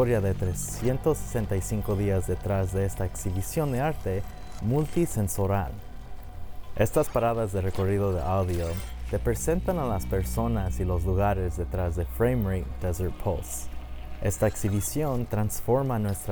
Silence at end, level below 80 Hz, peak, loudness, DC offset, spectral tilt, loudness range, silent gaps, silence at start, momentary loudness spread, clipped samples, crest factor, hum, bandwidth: 0 s; -38 dBFS; -10 dBFS; -28 LUFS; under 0.1%; -6.5 dB/octave; 2 LU; none; 0 s; 9 LU; under 0.1%; 18 dB; none; over 20 kHz